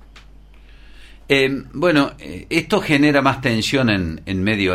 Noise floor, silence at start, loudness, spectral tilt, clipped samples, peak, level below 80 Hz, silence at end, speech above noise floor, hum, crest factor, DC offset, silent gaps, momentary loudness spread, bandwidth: -43 dBFS; 0.15 s; -18 LUFS; -5.5 dB/octave; under 0.1%; -2 dBFS; -42 dBFS; 0 s; 25 dB; none; 16 dB; under 0.1%; none; 7 LU; 15.5 kHz